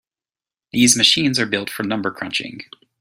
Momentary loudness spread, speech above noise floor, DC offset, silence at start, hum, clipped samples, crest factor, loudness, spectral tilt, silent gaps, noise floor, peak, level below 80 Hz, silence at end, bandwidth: 14 LU; over 71 dB; under 0.1%; 0.75 s; none; under 0.1%; 20 dB; -17 LUFS; -2 dB/octave; none; under -90 dBFS; 0 dBFS; -58 dBFS; 0.4 s; 16 kHz